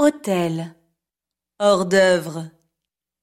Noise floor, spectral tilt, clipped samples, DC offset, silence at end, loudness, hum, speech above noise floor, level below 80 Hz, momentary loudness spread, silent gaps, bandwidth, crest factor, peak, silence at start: -87 dBFS; -5 dB/octave; under 0.1%; under 0.1%; 0.75 s; -19 LUFS; none; 68 dB; -66 dBFS; 18 LU; none; 15.5 kHz; 18 dB; -4 dBFS; 0 s